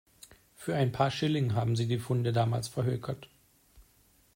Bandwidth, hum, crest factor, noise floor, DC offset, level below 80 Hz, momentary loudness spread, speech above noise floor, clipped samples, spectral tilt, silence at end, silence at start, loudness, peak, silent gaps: 16 kHz; none; 18 dB; -65 dBFS; under 0.1%; -62 dBFS; 9 LU; 36 dB; under 0.1%; -6.5 dB/octave; 0.55 s; 0.6 s; -31 LUFS; -14 dBFS; none